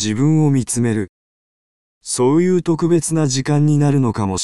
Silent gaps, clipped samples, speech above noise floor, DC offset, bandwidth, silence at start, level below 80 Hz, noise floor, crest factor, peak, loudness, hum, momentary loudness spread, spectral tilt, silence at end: 1.09-2.01 s; under 0.1%; over 74 dB; 1%; 12.5 kHz; 0 s; -48 dBFS; under -90 dBFS; 12 dB; -4 dBFS; -16 LUFS; none; 8 LU; -6 dB/octave; 0 s